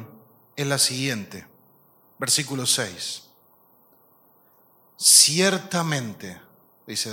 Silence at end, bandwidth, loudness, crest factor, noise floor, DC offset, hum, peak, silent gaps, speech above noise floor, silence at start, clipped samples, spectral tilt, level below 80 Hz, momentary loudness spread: 0 s; 17 kHz; -20 LUFS; 24 dB; -58 dBFS; under 0.1%; none; -2 dBFS; none; 36 dB; 0 s; under 0.1%; -1.5 dB/octave; -72 dBFS; 26 LU